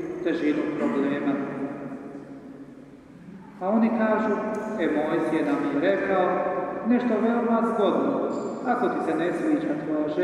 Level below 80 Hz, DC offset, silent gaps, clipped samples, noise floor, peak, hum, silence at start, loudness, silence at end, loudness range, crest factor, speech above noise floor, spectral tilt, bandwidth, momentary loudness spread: -64 dBFS; under 0.1%; none; under 0.1%; -46 dBFS; -10 dBFS; none; 0 s; -25 LUFS; 0 s; 5 LU; 16 dB; 22 dB; -7.5 dB/octave; 10.5 kHz; 16 LU